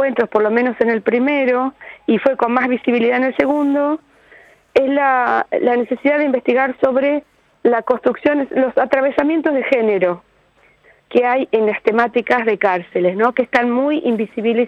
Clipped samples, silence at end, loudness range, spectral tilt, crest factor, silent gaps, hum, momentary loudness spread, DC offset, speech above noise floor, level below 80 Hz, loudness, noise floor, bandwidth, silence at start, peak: under 0.1%; 0 s; 1 LU; -7 dB/octave; 14 dB; none; none; 4 LU; under 0.1%; 38 dB; -60 dBFS; -16 LUFS; -54 dBFS; 6.8 kHz; 0 s; -2 dBFS